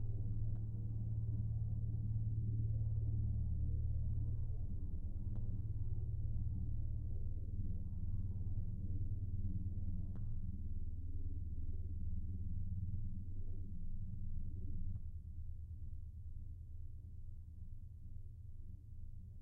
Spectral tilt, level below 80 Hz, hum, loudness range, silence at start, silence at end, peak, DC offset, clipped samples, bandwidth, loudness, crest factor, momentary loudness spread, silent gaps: -16.5 dB/octave; -44 dBFS; none; 11 LU; 0 s; 0 s; -28 dBFS; under 0.1%; under 0.1%; 1 kHz; -45 LUFS; 12 dB; 14 LU; none